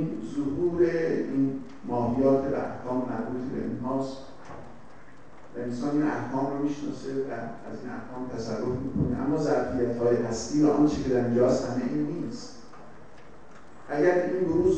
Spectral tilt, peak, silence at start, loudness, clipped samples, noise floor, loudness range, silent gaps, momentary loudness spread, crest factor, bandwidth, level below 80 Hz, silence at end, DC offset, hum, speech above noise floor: -7 dB/octave; -10 dBFS; 0 s; -28 LUFS; under 0.1%; -51 dBFS; 7 LU; none; 14 LU; 18 dB; 8.8 kHz; -52 dBFS; 0 s; 0.8%; none; 24 dB